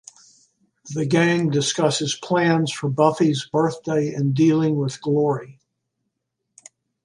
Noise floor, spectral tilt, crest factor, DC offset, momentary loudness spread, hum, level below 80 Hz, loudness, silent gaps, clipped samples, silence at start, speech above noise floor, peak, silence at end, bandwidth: -78 dBFS; -5.5 dB/octave; 18 dB; under 0.1%; 6 LU; none; -66 dBFS; -20 LUFS; none; under 0.1%; 0.85 s; 58 dB; -2 dBFS; 1.5 s; 11.5 kHz